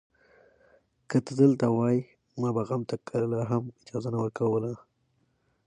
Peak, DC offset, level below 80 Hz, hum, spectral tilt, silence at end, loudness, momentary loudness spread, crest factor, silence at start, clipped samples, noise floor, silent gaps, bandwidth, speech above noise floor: -8 dBFS; under 0.1%; -66 dBFS; none; -8.5 dB/octave; 0.9 s; -28 LUFS; 13 LU; 20 dB; 1.1 s; under 0.1%; -72 dBFS; none; 10 kHz; 45 dB